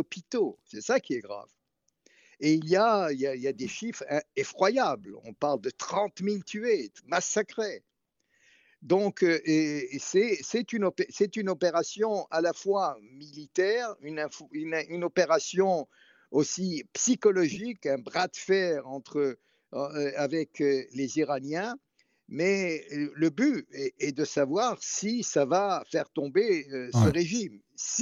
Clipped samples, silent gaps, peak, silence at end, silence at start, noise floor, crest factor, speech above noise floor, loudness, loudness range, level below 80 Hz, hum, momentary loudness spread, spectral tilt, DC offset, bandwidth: under 0.1%; none; -10 dBFS; 0 s; 0 s; -74 dBFS; 18 dB; 46 dB; -29 LUFS; 3 LU; -68 dBFS; none; 10 LU; -4.5 dB/octave; under 0.1%; 9.2 kHz